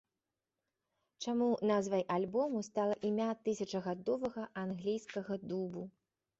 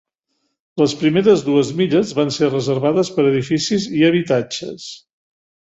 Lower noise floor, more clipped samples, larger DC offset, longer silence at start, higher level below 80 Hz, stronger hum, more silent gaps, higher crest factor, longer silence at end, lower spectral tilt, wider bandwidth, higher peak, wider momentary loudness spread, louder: first, under -90 dBFS vs -71 dBFS; neither; neither; first, 1.2 s vs 0.75 s; second, -76 dBFS vs -58 dBFS; neither; neither; about the same, 16 dB vs 16 dB; second, 0.5 s vs 0.8 s; about the same, -6 dB/octave vs -5.5 dB/octave; about the same, 8 kHz vs 8 kHz; second, -20 dBFS vs -2 dBFS; second, 8 LU vs 12 LU; second, -37 LUFS vs -17 LUFS